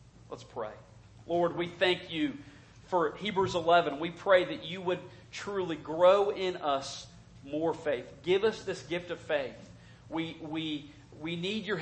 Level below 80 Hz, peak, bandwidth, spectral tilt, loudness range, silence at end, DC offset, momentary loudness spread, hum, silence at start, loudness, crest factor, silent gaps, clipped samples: -64 dBFS; -10 dBFS; 8.8 kHz; -5 dB/octave; 6 LU; 0 s; under 0.1%; 16 LU; none; 0.3 s; -31 LUFS; 22 dB; none; under 0.1%